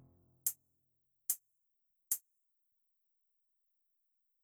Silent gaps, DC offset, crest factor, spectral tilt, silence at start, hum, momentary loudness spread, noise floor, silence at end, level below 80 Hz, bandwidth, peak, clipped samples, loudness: none; under 0.1%; 30 dB; 1.5 dB/octave; 0.45 s; none; 4 LU; -81 dBFS; 2.25 s; under -90 dBFS; over 20 kHz; -18 dBFS; under 0.1%; -39 LUFS